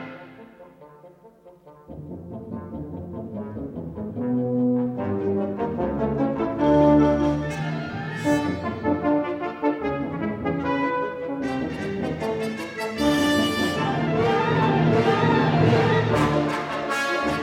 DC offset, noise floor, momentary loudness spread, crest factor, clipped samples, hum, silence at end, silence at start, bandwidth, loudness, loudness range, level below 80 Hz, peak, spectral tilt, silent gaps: under 0.1%; -50 dBFS; 15 LU; 18 dB; under 0.1%; none; 0 s; 0 s; 15.5 kHz; -23 LUFS; 12 LU; -46 dBFS; -6 dBFS; -6.5 dB/octave; none